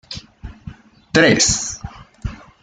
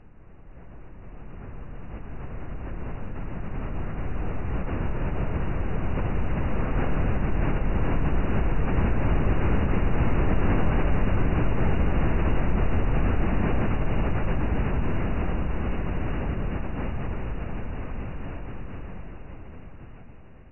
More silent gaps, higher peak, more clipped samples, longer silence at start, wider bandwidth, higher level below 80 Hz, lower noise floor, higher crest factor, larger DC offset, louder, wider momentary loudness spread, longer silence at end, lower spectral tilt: neither; first, 0 dBFS vs -12 dBFS; neither; about the same, 0.1 s vs 0 s; first, 10.5 kHz vs 3.1 kHz; second, -38 dBFS vs -28 dBFS; second, -39 dBFS vs -48 dBFS; first, 20 dB vs 14 dB; second, under 0.1% vs 3%; first, -15 LUFS vs -28 LUFS; first, 24 LU vs 17 LU; first, 0.25 s vs 0 s; second, -3 dB/octave vs -10 dB/octave